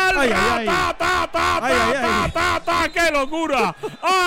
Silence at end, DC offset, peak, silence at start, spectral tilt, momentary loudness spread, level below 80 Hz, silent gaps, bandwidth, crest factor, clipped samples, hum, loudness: 0 s; under 0.1%; -6 dBFS; 0 s; -3.5 dB/octave; 4 LU; -38 dBFS; none; 17 kHz; 12 dB; under 0.1%; none; -19 LUFS